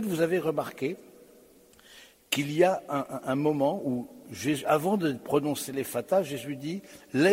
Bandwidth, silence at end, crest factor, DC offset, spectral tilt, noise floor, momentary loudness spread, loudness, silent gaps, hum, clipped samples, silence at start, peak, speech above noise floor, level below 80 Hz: 16 kHz; 0 s; 20 dB; under 0.1%; -5 dB/octave; -57 dBFS; 10 LU; -29 LUFS; none; none; under 0.1%; 0 s; -8 dBFS; 29 dB; -70 dBFS